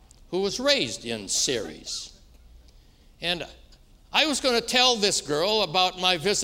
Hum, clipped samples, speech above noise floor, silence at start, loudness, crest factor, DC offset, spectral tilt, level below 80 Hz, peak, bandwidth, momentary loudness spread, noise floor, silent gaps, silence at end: none; under 0.1%; 29 dB; 0.3 s; -24 LUFS; 22 dB; under 0.1%; -1.5 dB/octave; -52 dBFS; -4 dBFS; 16 kHz; 13 LU; -54 dBFS; none; 0 s